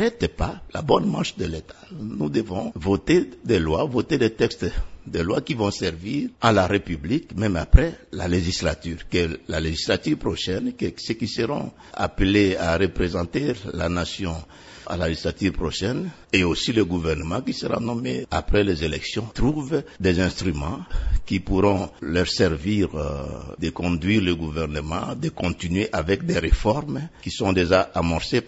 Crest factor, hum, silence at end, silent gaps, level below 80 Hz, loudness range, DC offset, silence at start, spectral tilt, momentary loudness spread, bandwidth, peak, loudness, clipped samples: 22 dB; none; 0 s; none; -32 dBFS; 3 LU; under 0.1%; 0 s; -6 dB/octave; 10 LU; 8 kHz; 0 dBFS; -24 LUFS; under 0.1%